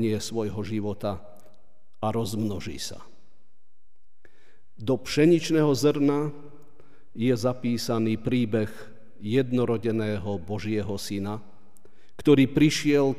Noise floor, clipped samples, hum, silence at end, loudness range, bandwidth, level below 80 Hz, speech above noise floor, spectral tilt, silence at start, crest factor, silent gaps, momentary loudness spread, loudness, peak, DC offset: -73 dBFS; under 0.1%; none; 0 s; 9 LU; 15.5 kHz; -56 dBFS; 48 dB; -6 dB/octave; 0 s; 20 dB; none; 14 LU; -26 LUFS; -8 dBFS; 1%